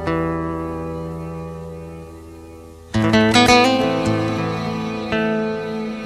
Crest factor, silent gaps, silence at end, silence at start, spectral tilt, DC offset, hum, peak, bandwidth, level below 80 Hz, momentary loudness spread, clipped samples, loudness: 20 dB; none; 0 s; 0 s; -5 dB/octave; under 0.1%; none; 0 dBFS; 14 kHz; -42 dBFS; 23 LU; under 0.1%; -19 LUFS